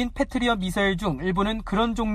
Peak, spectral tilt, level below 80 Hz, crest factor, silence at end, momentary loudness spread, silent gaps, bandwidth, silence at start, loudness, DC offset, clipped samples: -10 dBFS; -5.5 dB/octave; -38 dBFS; 14 dB; 0 s; 2 LU; none; 14.5 kHz; 0 s; -25 LUFS; under 0.1%; under 0.1%